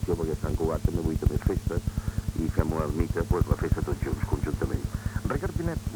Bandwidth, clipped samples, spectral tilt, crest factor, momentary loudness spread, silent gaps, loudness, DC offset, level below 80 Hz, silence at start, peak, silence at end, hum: over 20 kHz; under 0.1%; -7.5 dB/octave; 18 dB; 5 LU; none; -29 LUFS; under 0.1%; -32 dBFS; 0 s; -8 dBFS; 0 s; none